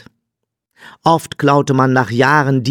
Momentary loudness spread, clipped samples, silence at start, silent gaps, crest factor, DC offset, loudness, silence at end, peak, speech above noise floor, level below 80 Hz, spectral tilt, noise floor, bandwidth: 3 LU; under 0.1%; 1.05 s; none; 14 dB; under 0.1%; -14 LUFS; 0 s; 0 dBFS; 64 dB; -56 dBFS; -6 dB/octave; -77 dBFS; 17.5 kHz